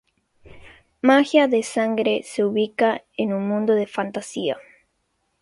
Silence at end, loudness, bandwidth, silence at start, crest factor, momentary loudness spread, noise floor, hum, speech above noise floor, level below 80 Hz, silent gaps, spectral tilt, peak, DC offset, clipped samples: 0.8 s; -21 LUFS; 11.5 kHz; 0.55 s; 20 dB; 10 LU; -71 dBFS; none; 51 dB; -62 dBFS; none; -5 dB/octave; -2 dBFS; under 0.1%; under 0.1%